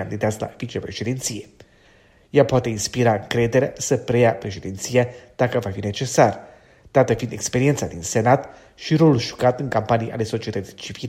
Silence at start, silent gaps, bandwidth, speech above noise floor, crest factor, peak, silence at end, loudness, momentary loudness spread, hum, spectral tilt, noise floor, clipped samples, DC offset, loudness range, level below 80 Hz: 0 s; none; 16 kHz; 33 dB; 20 dB; 0 dBFS; 0 s; -21 LUFS; 12 LU; none; -5.5 dB/octave; -54 dBFS; under 0.1%; under 0.1%; 2 LU; -50 dBFS